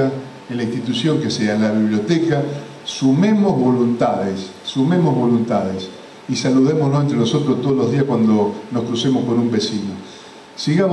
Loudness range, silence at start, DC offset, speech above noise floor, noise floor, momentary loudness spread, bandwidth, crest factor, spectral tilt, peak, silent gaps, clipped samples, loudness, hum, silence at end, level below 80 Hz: 2 LU; 0 s; under 0.1%; 22 dB; -39 dBFS; 13 LU; 10.5 kHz; 12 dB; -6.5 dB/octave; -6 dBFS; none; under 0.1%; -18 LUFS; none; 0 s; -60 dBFS